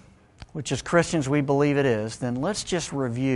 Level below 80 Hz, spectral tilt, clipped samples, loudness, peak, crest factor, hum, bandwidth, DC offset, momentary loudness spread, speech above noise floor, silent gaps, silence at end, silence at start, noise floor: -52 dBFS; -5.5 dB/octave; under 0.1%; -25 LUFS; -8 dBFS; 18 dB; none; 11.5 kHz; under 0.1%; 8 LU; 24 dB; none; 0 s; 0.4 s; -48 dBFS